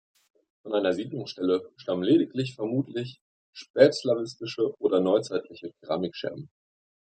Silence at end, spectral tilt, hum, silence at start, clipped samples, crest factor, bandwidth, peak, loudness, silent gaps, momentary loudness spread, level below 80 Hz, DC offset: 0.65 s; -6.5 dB/octave; none; 0.65 s; under 0.1%; 24 dB; 9.2 kHz; -4 dBFS; -27 LUFS; 3.21-3.53 s, 3.70-3.74 s; 15 LU; -74 dBFS; under 0.1%